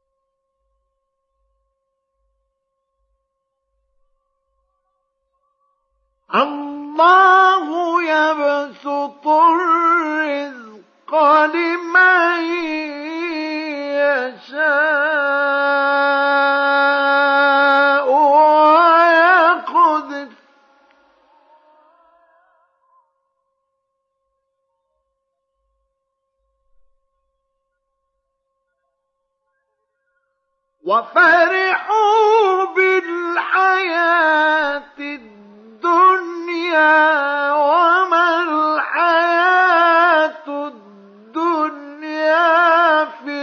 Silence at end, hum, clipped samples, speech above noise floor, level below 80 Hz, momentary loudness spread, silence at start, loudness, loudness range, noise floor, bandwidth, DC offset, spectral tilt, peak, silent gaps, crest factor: 0 s; none; under 0.1%; 60 dB; -72 dBFS; 13 LU; 6.3 s; -14 LUFS; 6 LU; -74 dBFS; 7 kHz; under 0.1%; -3 dB/octave; -2 dBFS; none; 14 dB